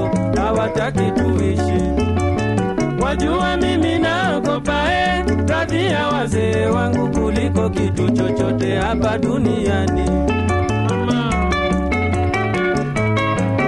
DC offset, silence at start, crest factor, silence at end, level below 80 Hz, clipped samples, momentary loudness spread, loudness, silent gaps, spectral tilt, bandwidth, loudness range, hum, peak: under 0.1%; 0 s; 12 dB; 0 s; -30 dBFS; under 0.1%; 2 LU; -18 LUFS; none; -6.5 dB/octave; 11.5 kHz; 1 LU; none; -4 dBFS